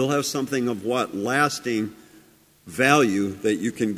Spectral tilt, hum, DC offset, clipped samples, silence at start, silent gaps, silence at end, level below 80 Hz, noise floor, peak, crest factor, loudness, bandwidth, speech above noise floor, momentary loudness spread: -4.5 dB/octave; none; under 0.1%; under 0.1%; 0 s; none; 0 s; -60 dBFS; -54 dBFS; -4 dBFS; 20 dB; -23 LUFS; 16 kHz; 31 dB; 9 LU